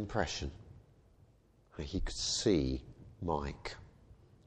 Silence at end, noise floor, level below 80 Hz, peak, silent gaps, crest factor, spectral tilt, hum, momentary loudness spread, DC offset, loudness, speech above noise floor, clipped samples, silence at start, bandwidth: 0.35 s; -66 dBFS; -48 dBFS; -16 dBFS; none; 22 dB; -4.5 dB/octave; none; 24 LU; under 0.1%; -36 LUFS; 31 dB; under 0.1%; 0 s; 9.8 kHz